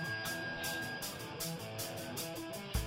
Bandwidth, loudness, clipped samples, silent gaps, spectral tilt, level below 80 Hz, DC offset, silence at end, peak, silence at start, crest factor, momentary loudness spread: 17.5 kHz; -40 LUFS; under 0.1%; none; -3 dB/octave; -52 dBFS; under 0.1%; 0 s; -22 dBFS; 0 s; 18 dB; 3 LU